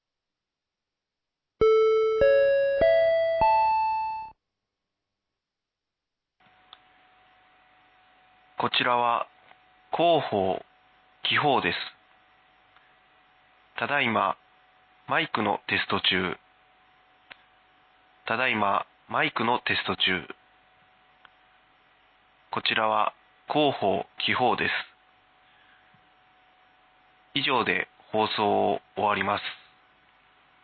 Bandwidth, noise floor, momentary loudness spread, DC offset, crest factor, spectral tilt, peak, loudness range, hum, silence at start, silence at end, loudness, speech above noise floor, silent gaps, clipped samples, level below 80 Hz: 6 kHz; -87 dBFS; 13 LU; under 0.1%; 20 dB; -6.5 dB/octave; -8 dBFS; 8 LU; none; 1.6 s; 1.1 s; -25 LUFS; 61 dB; none; under 0.1%; -58 dBFS